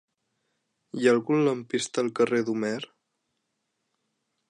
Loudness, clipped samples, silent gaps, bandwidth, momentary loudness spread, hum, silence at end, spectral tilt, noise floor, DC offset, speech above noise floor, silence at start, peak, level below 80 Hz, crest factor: -26 LUFS; under 0.1%; none; 11 kHz; 12 LU; none; 1.65 s; -5 dB/octave; -79 dBFS; under 0.1%; 54 dB; 0.95 s; -8 dBFS; -78 dBFS; 20 dB